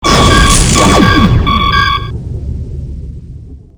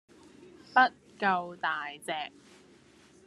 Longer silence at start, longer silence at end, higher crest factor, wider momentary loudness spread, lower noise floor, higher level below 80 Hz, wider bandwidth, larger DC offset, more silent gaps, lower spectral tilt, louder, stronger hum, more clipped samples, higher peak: second, 0 s vs 0.4 s; second, 0.2 s vs 1 s; second, 10 dB vs 22 dB; first, 18 LU vs 12 LU; second, -29 dBFS vs -59 dBFS; first, -16 dBFS vs -78 dBFS; first, over 20 kHz vs 12.5 kHz; neither; neither; about the same, -4 dB/octave vs -4 dB/octave; first, -8 LUFS vs -30 LUFS; neither; first, 0.6% vs under 0.1%; first, 0 dBFS vs -10 dBFS